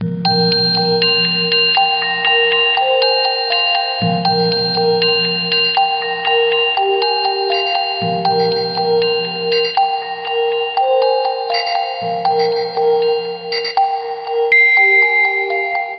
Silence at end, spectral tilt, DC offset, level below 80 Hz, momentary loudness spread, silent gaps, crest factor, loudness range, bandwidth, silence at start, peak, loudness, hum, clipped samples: 0 s; -0.5 dB/octave; under 0.1%; -64 dBFS; 7 LU; none; 14 dB; 4 LU; 6 kHz; 0 s; -2 dBFS; -14 LUFS; none; under 0.1%